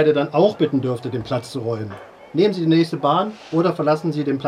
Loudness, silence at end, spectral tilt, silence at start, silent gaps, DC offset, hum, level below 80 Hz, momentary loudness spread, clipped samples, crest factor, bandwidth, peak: -20 LUFS; 0 s; -7.5 dB/octave; 0 s; none; under 0.1%; none; -60 dBFS; 9 LU; under 0.1%; 16 dB; 11.5 kHz; -4 dBFS